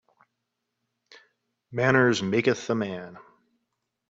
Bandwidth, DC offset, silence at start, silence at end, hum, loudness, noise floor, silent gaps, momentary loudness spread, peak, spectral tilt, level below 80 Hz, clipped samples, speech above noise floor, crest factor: 7.8 kHz; under 0.1%; 1.7 s; 0.9 s; none; -24 LUFS; -81 dBFS; none; 17 LU; -6 dBFS; -5.5 dB/octave; -66 dBFS; under 0.1%; 57 dB; 24 dB